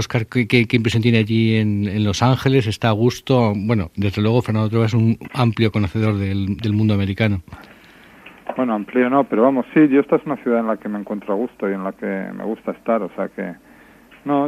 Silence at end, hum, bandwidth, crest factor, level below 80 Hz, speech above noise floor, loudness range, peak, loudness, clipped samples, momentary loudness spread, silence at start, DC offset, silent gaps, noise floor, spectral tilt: 0 s; none; 13.5 kHz; 18 dB; -50 dBFS; 29 dB; 6 LU; 0 dBFS; -19 LUFS; under 0.1%; 10 LU; 0 s; under 0.1%; none; -47 dBFS; -7 dB/octave